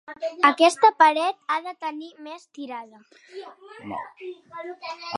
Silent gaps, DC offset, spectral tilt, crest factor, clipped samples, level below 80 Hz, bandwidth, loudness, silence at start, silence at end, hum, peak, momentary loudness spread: none; under 0.1%; -2.5 dB/octave; 22 dB; under 0.1%; -76 dBFS; 11.5 kHz; -20 LUFS; 0.1 s; 0 s; none; -2 dBFS; 24 LU